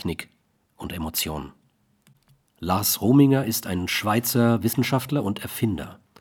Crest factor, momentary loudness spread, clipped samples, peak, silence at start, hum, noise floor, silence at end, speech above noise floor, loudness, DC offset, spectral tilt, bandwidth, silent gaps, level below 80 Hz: 18 dB; 17 LU; under 0.1%; -6 dBFS; 0 s; none; -64 dBFS; 0.25 s; 42 dB; -23 LUFS; under 0.1%; -5 dB/octave; 20 kHz; none; -50 dBFS